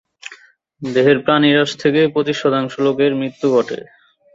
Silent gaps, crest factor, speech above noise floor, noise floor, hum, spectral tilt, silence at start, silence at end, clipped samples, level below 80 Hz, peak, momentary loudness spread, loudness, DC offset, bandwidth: none; 16 dB; 30 dB; -45 dBFS; none; -6 dB/octave; 0.25 s; 0.5 s; under 0.1%; -60 dBFS; -2 dBFS; 17 LU; -16 LUFS; under 0.1%; 7.8 kHz